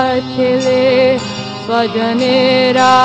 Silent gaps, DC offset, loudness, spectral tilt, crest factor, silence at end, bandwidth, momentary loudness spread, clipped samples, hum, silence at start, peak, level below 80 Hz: none; under 0.1%; -13 LUFS; -5 dB/octave; 12 dB; 0 s; 8.6 kHz; 7 LU; under 0.1%; none; 0 s; 0 dBFS; -52 dBFS